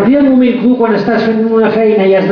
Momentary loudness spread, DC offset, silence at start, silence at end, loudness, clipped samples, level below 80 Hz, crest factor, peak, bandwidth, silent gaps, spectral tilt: 3 LU; under 0.1%; 0 s; 0 s; -10 LUFS; under 0.1%; -48 dBFS; 8 dB; 0 dBFS; 5.4 kHz; none; -8.5 dB/octave